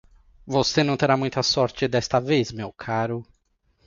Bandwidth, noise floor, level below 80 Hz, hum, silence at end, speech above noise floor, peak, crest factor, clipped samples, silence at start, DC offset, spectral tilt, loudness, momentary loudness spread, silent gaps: 7.6 kHz; -67 dBFS; -52 dBFS; none; 0.65 s; 44 dB; -4 dBFS; 20 dB; under 0.1%; 0.45 s; under 0.1%; -5 dB/octave; -23 LUFS; 9 LU; none